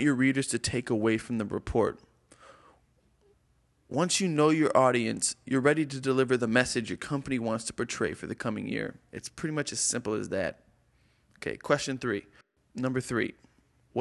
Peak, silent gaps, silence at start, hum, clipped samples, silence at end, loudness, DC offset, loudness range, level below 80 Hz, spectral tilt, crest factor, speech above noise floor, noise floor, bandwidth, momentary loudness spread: -8 dBFS; none; 0 s; none; under 0.1%; 0 s; -29 LUFS; under 0.1%; 7 LU; -56 dBFS; -4.5 dB/octave; 22 dB; 40 dB; -68 dBFS; 12 kHz; 11 LU